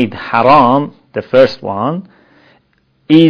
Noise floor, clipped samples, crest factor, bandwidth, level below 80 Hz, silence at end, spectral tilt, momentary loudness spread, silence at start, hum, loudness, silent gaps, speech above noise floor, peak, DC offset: -57 dBFS; 0.8%; 12 dB; 5.4 kHz; -48 dBFS; 0 s; -8 dB/octave; 14 LU; 0 s; none; -12 LUFS; none; 46 dB; 0 dBFS; under 0.1%